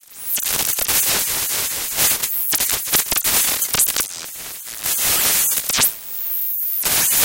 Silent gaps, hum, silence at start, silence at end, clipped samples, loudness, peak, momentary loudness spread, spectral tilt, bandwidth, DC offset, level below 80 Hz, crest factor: none; none; 0.1 s; 0 s; under 0.1%; -16 LUFS; 0 dBFS; 8 LU; 0.5 dB/octave; 18 kHz; under 0.1%; -48 dBFS; 18 dB